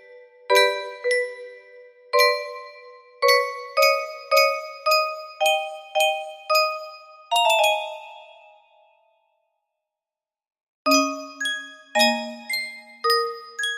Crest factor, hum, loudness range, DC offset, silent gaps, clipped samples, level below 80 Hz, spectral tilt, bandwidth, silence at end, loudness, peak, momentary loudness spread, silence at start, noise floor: 20 dB; none; 6 LU; under 0.1%; 10.63-10.85 s; under 0.1%; -76 dBFS; 0 dB/octave; 15.5 kHz; 0 s; -21 LUFS; -4 dBFS; 15 LU; 0.1 s; under -90 dBFS